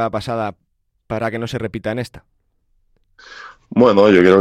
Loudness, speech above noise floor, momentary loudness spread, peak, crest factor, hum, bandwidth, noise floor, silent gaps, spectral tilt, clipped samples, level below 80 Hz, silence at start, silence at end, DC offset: -17 LUFS; 46 dB; 23 LU; 0 dBFS; 18 dB; none; 12.5 kHz; -62 dBFS; none; -7 dB/octave; under 0.1%; -50 dBFS; 0 s; 0 s; under 0.1%